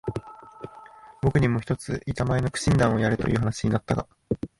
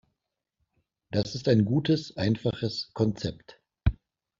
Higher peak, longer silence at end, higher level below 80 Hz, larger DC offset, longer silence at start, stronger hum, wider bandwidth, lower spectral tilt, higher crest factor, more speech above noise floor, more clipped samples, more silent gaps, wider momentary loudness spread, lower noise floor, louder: about the same, -8 dBFS vs -8 dBFS; second, 0.15 s vs 0.5 s; about the same, -42 dBFS vs -42 dBFS; neither; second, 0.05 s vs 1.1 s; neither; first, 11.5 kHz vs 7.6 kHz; about the same, -6.5 dB/octave vs -6.5 dB/octave; about the same, 16 dB vs 20 dB; second, 24 dB vs 57 dB; neither; neither; first, 21 LU vs 8 LU; second, -47 dBFS vs -83 dBFS; first, -25 LUFS vs -28 LUFS